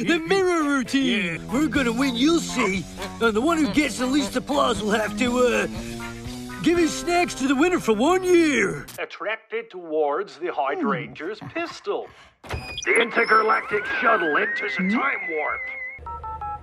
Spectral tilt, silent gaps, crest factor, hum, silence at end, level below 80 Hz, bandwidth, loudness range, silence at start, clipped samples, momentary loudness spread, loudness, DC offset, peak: -4 dB/octave; none; 18 dB; none; 0 s; -48 dBFS; 14.5 kHz; 5 LU; 0 s; under 0.1%; 13 LU; -22 LUFS; under 0.1%; -6 dBFS